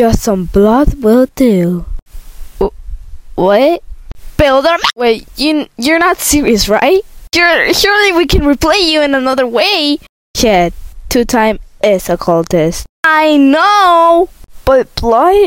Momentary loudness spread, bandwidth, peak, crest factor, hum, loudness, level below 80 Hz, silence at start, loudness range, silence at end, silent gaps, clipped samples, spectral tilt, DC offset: 9 LU; 16.5 kHz; 0 dBFS; 10 dB; none; -10 LUFS; -26 dBFS; 0 s; 4 LU; 0 s; 2.02-2.06 s, 10.09-10.34 s, 12.89-13.03 s; under 0.1%; -4 dB/octave; under 0.1%